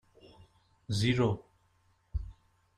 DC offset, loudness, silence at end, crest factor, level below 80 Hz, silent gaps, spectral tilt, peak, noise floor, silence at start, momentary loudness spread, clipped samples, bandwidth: under 0.1%; -33 LUFS; 0.45 s; 20 dB; -48 dBFS; none; -6 dB/octave; -16 dBFS; -70 dBFS; 0.9 s; 14 LU; under 0.1%; 13 kHz